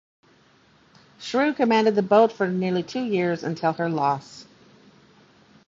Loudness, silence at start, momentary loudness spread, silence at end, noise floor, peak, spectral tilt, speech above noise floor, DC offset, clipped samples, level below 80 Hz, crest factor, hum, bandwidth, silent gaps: -22 LUFS; 1.2 s; 9 LU; 1.25 s; -58 dBFS; -4 dBFS; -6.5 dB/octave; 36 dB; under 0.1%; under 0.1%; -68 dBFS; 20 dB; none; 7.8 kHz; none